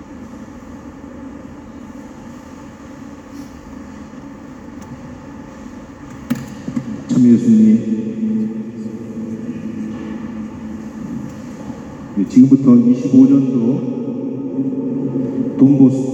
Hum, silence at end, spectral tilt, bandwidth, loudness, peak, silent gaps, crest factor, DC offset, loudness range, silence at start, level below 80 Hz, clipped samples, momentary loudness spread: none; 0 s; -8.5 dB/octave; 8 kHz; -15 LUFS; 0 dBFS; none; 16 dB; under 0.1%; 20 LU; 0 s; -48 dBFS; under 0.1%; 24 LU